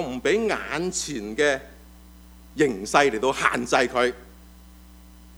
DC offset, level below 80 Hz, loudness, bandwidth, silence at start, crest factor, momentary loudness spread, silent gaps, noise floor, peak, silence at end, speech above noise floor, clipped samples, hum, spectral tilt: under 0.1%; -48 dBFS; -23 LUFS; over 20 kHz; 0 s; 24 dB; 9 LU; none; -47 dBFS; -2 dBFS; 0 s; 24 dB; under 0.1%; none; -3.5 dB/octave